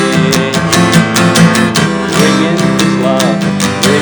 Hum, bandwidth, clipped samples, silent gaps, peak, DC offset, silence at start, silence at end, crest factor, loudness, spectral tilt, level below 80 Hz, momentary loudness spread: none; over 20 kHz; 0.3%; none; 0 dBFS; under 0.1%; 0 s; 0 s; 10 dB; -9 LUFS; -4.5 dB/octave; -40 dBFS; 4 LU